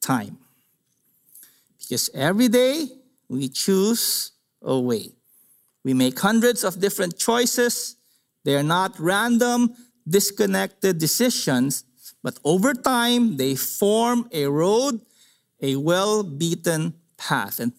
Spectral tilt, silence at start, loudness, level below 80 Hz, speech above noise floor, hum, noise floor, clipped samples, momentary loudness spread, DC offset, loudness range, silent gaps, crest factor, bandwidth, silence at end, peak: -4 dB/octave; 0 s; -21 LUFS; -68 dBFS; 46 dB; none; -67 dBFS; under 0.1%; 11 LU; under 0.1%; 3 LU; none; 20 dB; 16 kHz; 0.05 s; -2 dBFS